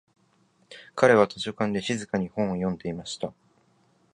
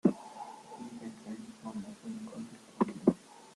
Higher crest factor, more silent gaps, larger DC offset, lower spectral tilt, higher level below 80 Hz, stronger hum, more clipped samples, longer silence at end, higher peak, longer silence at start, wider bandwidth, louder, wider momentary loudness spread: about the same, 24 dB vs 26 dB; neither; neither; second, -5.5 dB/octave vs -7.5 dB/octave; first, -60 dBFS vs -74 dBFS; neither; neither; first, 0.8 s vs 0 s; first, -4 dBFS vs -12 dBFS; first, 0.7 s vs 0.05 s; about the same, 11 kHz vs 12 kHz; first, -26 LUFS vs -38 LUFS; about the same, 16 LU vs 16 LU